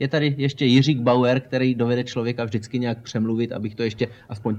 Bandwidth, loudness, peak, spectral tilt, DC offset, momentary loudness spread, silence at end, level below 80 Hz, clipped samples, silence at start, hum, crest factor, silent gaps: 8.4 kHz; -22 LUFS; -4 dBFS; -7 dB/octave; under 0.1%; 9 LU; 0 s; -60 dBFS; under 0.1%; 0 s; none; 18 dB; none